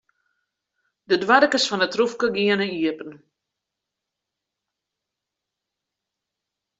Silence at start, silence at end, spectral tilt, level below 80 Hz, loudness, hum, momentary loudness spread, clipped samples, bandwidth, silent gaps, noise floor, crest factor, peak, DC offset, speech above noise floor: 1.1 s; 3.65 s; -3.5 dB/octave; -70 dBFS; -20 LUFS; none; 10 LU; under 0.1%; 8.2 kHz; none; -84 dBFS; 22 dB; -2 dBFS; under 0.1%; 64 dB